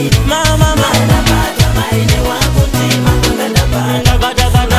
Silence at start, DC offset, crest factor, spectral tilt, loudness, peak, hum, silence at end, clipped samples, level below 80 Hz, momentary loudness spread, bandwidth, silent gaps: 0 s; under 0.1%; 10 dB; -4.5 dB/octave; -11 LUFS; 0 dBFS; none; 0 s; under 0.1%; -16 dBFS; 2 LU; 16 kHz; none